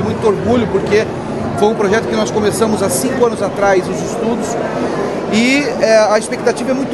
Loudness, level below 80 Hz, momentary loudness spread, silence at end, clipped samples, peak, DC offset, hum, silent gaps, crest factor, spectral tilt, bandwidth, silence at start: -14 LUFS; -42 dBFS; 6 LU; 0 s; under 0.1%; 0 dBFS; under 0.1%; none; none; 14 dB; -5 dB/octave; 12.5 kHz; 0 s